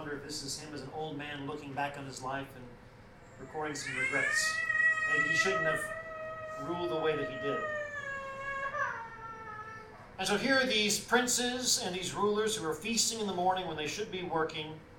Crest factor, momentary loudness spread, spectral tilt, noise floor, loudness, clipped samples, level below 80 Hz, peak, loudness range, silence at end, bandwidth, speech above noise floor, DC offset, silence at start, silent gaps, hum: 20 dB; 15 LU; -2 dB/octave; -54 dBFS; -32 LUFS; under 0.1%; -62 dBFS; -14 dBFS; 8 LU; 0 s; 18 kHz; 21 dB; under 0.1%; 0 s; none; none